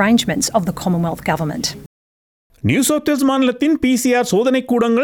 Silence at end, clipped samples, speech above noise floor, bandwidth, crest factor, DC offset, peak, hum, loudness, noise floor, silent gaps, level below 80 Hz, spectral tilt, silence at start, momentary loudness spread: 0 s; under 0.1%; over 74 dB; 19.5 kHz; 16 dB; under 0.1%; -2 dBFS; none; -17 LUFS; under -90 dBFS; 1.86-2.50 s; -46 dBFS; -4.5 dB/octave; 0 s; 6 LU